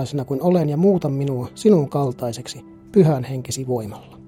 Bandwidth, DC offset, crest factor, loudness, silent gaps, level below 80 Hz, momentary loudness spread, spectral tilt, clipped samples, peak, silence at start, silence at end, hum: 16 kHz; under 0.1%; 16 dB; -20 LUFS; none; -56 dBFS; 12 LU; -7.5 dB/octave; under 0.1%; -4 dBFS; 0 s; 0.1 s; none